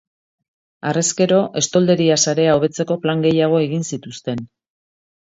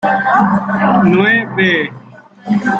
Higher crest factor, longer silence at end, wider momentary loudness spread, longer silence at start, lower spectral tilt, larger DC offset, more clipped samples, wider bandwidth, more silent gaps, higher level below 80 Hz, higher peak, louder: about the same, 16 dB vs 12 dB; first, 0.8 s vs 0 s; first, 12 LU vs 8 LU; first, 0.85 s vs 0 s; second, -4.5 dB/octave vs -7.5 dB/octave; neither; neither; about the same, 8 kHz vs 7.6 kHz; neither; second, -58 dBFS vs -52 dBFS; about the same, -2 dBFS vs -2 dBFS; second, -17 LUFS vs -12 LUFS